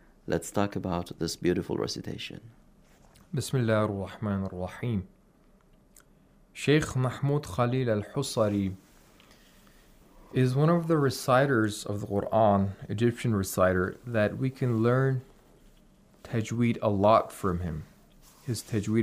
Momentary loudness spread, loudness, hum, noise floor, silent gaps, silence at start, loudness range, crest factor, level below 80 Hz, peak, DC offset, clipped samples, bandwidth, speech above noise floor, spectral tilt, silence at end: 11 LU; -28 LUFS; none; -61 dBFS; none; 0.25 s; 6 LU; 20 dB; -56 dBFS; -10 dBFS; under 0.1%; under 0.1%; 15.5 kHz; 33 dB; -6.5 dB/octave; 0 s